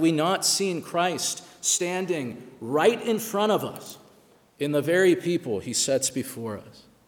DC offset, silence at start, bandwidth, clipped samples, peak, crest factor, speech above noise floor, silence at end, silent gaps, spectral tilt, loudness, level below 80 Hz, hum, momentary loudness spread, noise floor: under 0.1%; 0 s; 19.5 kHz; under 0.1%; -8 dBFS; 18 dB; 32 dB; 0.35 s; none; -3.5 dB/octave; -25 LUFS; -70 dBFS; none; 14 LU; -57 dBFS